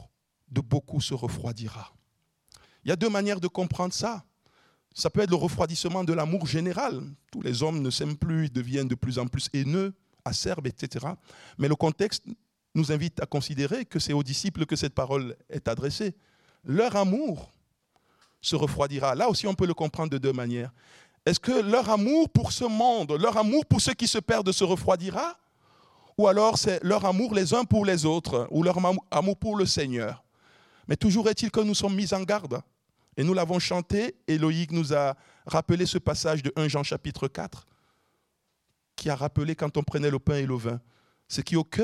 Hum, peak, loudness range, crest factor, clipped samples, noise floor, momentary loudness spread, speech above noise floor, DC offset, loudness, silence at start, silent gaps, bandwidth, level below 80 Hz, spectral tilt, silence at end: none; -8 dBFS; 6 LU; 20 dB; under 0.1%; -76 dBFS; 11 LU; 50 dB; under 0.1%; -27 LUFS; 0 s; none; 14 kHz; -54 dBFS; -5.5 dB/octave; 0 s